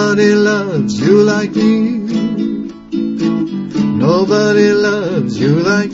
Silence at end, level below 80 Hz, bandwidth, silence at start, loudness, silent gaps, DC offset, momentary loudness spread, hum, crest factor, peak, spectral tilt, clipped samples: 0 s; -50 dBFS; 7.8 kHz; 0 s; -13 LUFS; none; under 0.1%; 8 LU; none; 12 dB; 0 dBFS; -6.5 dB/octave; under 0.1%